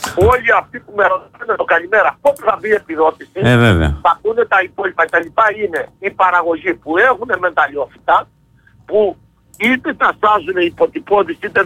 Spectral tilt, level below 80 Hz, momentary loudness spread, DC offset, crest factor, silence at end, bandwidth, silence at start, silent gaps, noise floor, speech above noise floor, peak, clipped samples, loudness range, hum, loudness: -6 dB/octave; -34 dBFS; 7 LU; under 0.1%; 12 dB; 0 s; 16 kHz; 0 s; none; -49 dBFS; 35 dB; -2 dBFS; under 0.1%; 2 LU; none; -15 LUFS